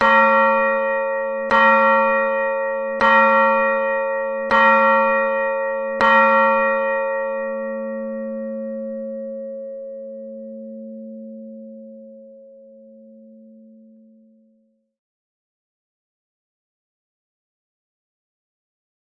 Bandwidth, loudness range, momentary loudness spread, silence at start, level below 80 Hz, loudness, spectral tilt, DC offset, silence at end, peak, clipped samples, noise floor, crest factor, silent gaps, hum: 6.4 kHz; 20 LU; 22 LU; 0 s; -58 dBFS; -17 LUFS; -5.5 dB/octave; under 0.1%; 6.75 s; -2 dBFS; under 0.1%; -63 dBFS; 18 dB; none; none